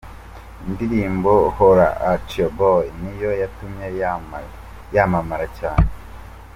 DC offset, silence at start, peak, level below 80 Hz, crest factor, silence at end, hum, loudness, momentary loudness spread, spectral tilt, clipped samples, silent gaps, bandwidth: under 0.1%; 0.05 s; -2 dBFS; -32 dBFS; 18 dB; 0.05 s; none; -19 LUFS; 25 LU; -8 dB/octave; under 0.1%; none; 16 kHz